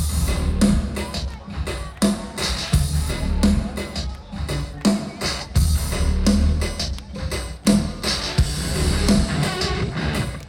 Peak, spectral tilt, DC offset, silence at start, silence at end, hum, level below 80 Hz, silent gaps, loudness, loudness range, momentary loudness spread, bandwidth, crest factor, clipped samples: -4 dBFS; -5 dB/octave; under 0.1%; 0 s; 0 s; none; -26 dBFS; none; -22 LUFS; 2 LU; 9 LU; 17 kHz; 18 dB; under 0.1%